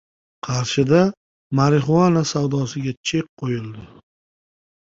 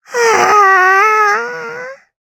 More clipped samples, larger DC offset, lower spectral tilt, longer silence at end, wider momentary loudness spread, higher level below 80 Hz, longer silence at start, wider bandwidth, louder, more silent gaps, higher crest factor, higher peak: neither; neither; first, -6 dB/octave vs -1.5 dB/octave; first, 1.05 s vs 0.25 s; second, 11 LU vs 18 LU; first, -52 dBFS vs -62 dBFS; first, 0.45 s vs 0.1 s; second, 7.8 kHz vs 18.5 kHz; second, -20 LUFS vs -9 LUFS; first, 1.17-1.50 s, 2.97-3.04 s, 3.29-3.37 s vs none; first, 18 dB vs 12 dB; about the same, -2 dBFS vs 0 dBFS